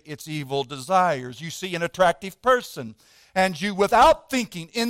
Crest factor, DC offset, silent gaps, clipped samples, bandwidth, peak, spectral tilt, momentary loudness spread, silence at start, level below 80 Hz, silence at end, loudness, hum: 18 dB; under 0.1%; none; under 0.1%; 16.5 kHz; -4 dBFS; -4 dB/octave; 16 LU; 0.05 s; -50 dBFS; 0 s; -22 LUFS; none